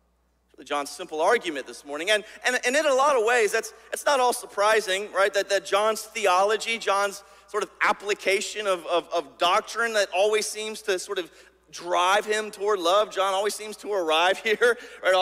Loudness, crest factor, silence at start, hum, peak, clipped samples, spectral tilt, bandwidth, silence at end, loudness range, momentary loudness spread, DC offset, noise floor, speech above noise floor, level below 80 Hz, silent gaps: -24 LUFS; 16 dB; 0.6 s; none; -8 dBFS; under 0.1%; -1 dB/octave; 16 kHz; 0 s; 3 LU; 10 LU; under 0.1%; -67 dBFS; 43 dB; -70 dBFS; none